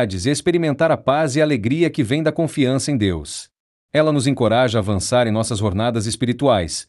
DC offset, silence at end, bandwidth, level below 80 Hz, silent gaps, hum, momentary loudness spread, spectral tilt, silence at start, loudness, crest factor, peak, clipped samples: under 0.1%; 0.05 s; 12 kHz; -48 dBFS; 3.60-3.89 s; none; 4 LU; -5.5 dB/octave; 0 s; -18 LUFS; 14 dB; -4 dBFS; under 0.1%